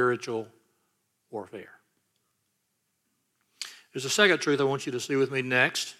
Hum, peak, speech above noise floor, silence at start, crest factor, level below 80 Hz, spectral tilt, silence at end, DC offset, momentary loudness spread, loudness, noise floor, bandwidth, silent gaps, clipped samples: none; -8 dBFS; 50 dB; 0 s; 22 dB; -78 dBFS; -3.5 dB/octave; 0.05 s; under 0.1%; 20 LU; -26 LUFS; -77 dBFS; 15.5 kHz; none; under 0.1%